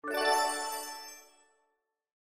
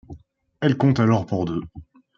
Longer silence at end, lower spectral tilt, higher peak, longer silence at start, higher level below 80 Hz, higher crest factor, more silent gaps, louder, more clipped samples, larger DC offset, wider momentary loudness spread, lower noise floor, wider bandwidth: first, 1.05 s vs 0.35 s; second, 0.5 dB/octave vs -8 dB/octave; second, -14 dBFS vs -6 dBFS; about the same, 0.05 s vs 0.1 s; second, -80 dBFS vs -52 dBFS; about the same, 20 dB vs 18 dB; neither; second, -31 LUFS vs -21 LUFS; neither; neither; first, 19 LU vs 12 LU; first, -80 dBFS vs -46 dBFS; first, 16 kHz vs 7.2 kHz